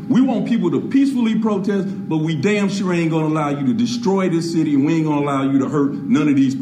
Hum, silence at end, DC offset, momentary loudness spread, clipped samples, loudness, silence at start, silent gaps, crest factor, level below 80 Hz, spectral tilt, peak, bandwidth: none; 0 s; under 0.1%; 3 LU; under 0.1%; -18 LUFS; 0 s; none; 12 dB; -62 dBFS; -7 dB/octave; -6 dBFS; 10 kHz